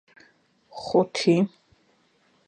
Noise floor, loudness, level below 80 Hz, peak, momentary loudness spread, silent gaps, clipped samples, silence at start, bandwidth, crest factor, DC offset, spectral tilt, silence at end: -64 dBFS; -23 LUFS; -70 dBFS; -8 dBFS; 17 LU; none; under 0.1%; 0.75 s; 9.6 kHz; 20 dB; under 0.1%; -6 dB/octave; 1 s